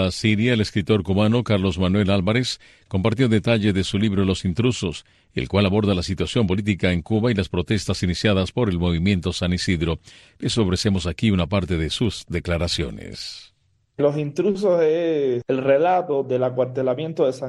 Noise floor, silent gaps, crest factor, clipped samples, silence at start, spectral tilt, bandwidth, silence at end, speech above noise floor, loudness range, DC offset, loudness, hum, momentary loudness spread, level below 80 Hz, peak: -64 dBFS; none; 16 dB; under 0.1%; 0 s; -6 dB/octave; 12 kHz; 0 s; 43 dB; 3 LU; under 0.1%; -21 LUFS; none; 8 LU; -42 dBFS; -4 dBFS